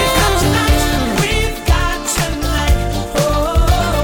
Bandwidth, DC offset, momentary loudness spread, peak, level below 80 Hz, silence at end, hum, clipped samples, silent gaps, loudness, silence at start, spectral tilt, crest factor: over 20 kHz; under 0.1%; 4 LU; -2 dBFS; -18 dBFS; 0 s; none; under 0.1%; none; -15 LUFS; 0 s; -4.5 dB/octave; 12 dB